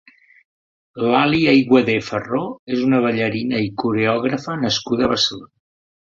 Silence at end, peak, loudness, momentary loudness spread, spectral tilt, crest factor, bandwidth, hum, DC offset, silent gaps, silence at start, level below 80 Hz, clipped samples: 0.65 s; -2 dBFS; -18 LUFS; 9 LU; -5.5 dB/octave; 18 dB; 7.6 kHz; none; under 0.1%; 2.59-2.67 s; 0.95 s; -52 dBFS; under 0.1%